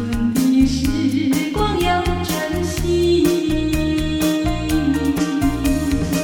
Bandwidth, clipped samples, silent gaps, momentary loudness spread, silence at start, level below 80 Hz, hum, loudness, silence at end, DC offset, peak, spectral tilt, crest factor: 17.5 kHz; under 0.1%; none; 5 LU; 0 s; -28 dBFS; none; -18 LUFS; 0 s; under 0.1%; -4 dBFS; -5.5 dB/octave; 14 dB